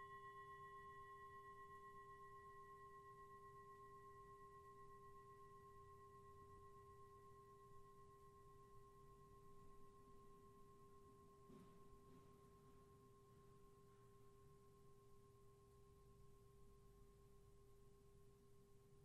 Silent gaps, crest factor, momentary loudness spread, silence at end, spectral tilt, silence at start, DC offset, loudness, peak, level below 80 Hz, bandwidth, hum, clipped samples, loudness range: none; 14 dB; 9 LU; 0 s; -5.5 dB/octave; 0 s; under 0.1%; -65 LUFS; -50 dBFS; -76 dBFS; 13 kHz; none; under 0.1%; 7 LU